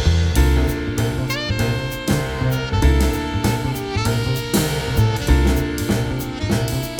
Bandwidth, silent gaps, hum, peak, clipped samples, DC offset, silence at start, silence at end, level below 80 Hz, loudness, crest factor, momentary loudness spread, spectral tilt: 19.5 kHz; none; none; -2 dBFS; under 0.1%; under 0.1%; 0 s; 0 s; -24 dBFS; -20 LUFS; 16 dB; 5 LU; -5.5 dB/octave